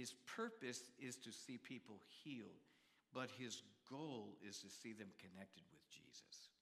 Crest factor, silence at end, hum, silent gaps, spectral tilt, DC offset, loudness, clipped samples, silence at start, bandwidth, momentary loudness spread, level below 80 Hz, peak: 22 dB; 0.1 s; none; none; -3.5 dB/octave; under 0.1%; -55 LUFS; under 0.1%; 0 s; 15 kHz; 12 LU; under -90 dBFS; -32 dBFS